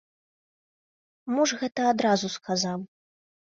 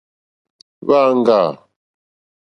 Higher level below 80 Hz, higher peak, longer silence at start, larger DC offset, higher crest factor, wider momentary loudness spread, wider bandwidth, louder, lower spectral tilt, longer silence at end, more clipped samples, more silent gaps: second, -72 dBFS vs -66 dBFS; second, -10 dBFS vs 0 dBFS; first, 1.25 s vs 0.85 s; neither; about the same, 20 dB vs 18 dB; first, 13 LU vs 9 LU; about the same, 7.8 kHz vs 8.2 kHz; second, -26 LUFS vs -15 LUFS; second, -4 dB/octave vs -7 dB/octave; second, 0.75 s vs 0.9 s; neither; neither